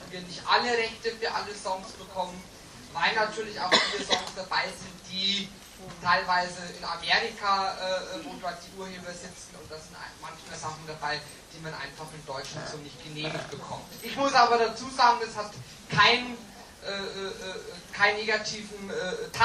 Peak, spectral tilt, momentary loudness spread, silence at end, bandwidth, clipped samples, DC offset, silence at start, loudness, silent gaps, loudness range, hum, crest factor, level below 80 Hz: -6 dBFS; -2.5 dB/octave; 18 LU; 0 s; 15 kHz; under 0.1%; under 0.1%; 0 s; -28 LUFS; none; 12 LU; none; 24 dB; -60 dBFS